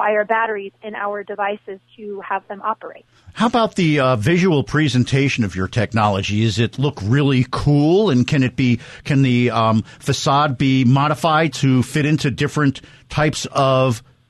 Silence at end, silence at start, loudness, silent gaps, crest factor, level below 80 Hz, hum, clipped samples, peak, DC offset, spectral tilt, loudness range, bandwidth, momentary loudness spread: 0.3 s; 0 s; -18 LUFS; none; 12 dB; -46 dBFS; none; under 0.1%; -4 dBFS; under 0.1%; -6 dB/octave; 5 LU; 12.5 kHz; 10 LU